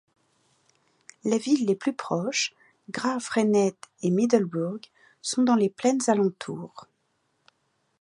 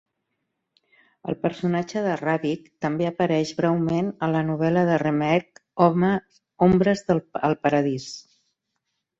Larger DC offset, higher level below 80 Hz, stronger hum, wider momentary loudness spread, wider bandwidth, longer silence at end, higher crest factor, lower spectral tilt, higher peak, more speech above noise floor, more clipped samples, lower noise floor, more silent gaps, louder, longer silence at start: neither; second, -76 dBFS vs -56 dBFS; neither; first, 13 LU vs 9 LU; first, 11.5 kHz vs 7.8 kHz; first, 1.2 s vs 1 s; about the same, 20 dB vs 20 dB; second, -5 dB/octave vs -7 dB/octave; second, -8 dBFS vs -4 dBFS; second, 48 dB vs 56 dB; neither; second, -73 dBFS vs -79 dBFS; neither; about the same, -25 LUFS vs -23 LUFS; about the same, 1.25 s vs 1.25 s